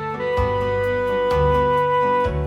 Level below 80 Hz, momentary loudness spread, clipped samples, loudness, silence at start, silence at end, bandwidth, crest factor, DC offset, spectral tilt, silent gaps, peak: -32 dBFS; 3 LU; under 0.1%; -20 LUFS; 0 s; 0 s; 11.5 kHz; 12 dB; under 0.1%; -7 dB/octave; none; -8 dBFS